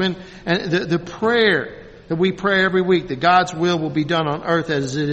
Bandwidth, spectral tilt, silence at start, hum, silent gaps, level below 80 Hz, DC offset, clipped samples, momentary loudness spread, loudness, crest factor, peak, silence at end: 8.4 kHz; -5.5 dB/octave; 0 s; none; none; -50 dBFS; under 0.1%; under 0.1%; 7 LU; -19 LUFS; 18 dB; -2 dBFS; 0 s